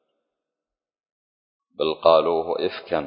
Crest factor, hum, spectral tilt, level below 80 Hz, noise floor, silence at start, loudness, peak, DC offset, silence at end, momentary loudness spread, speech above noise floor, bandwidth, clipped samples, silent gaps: 22 dB; none; -9 dB/octave; -60 dBFS; under -90 dBFS; 1.8 s; -21 LUFS; -2 dBFS; under 0.1%; 0 s; 9 LU; over 69 dB; 5.4 kHz; under 0.1%; none